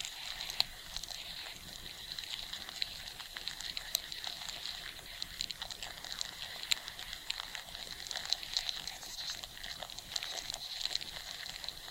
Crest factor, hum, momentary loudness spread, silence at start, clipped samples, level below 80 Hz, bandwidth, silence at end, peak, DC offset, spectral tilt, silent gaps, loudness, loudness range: 34 dB; none; 8 LU; 0 s; under 0.1%; -60 dBFS; 17 kHz; 0 s; -10 dBFS; under 0.1%; 0.5 dB/octave; none; -39 LUFS; 2 LU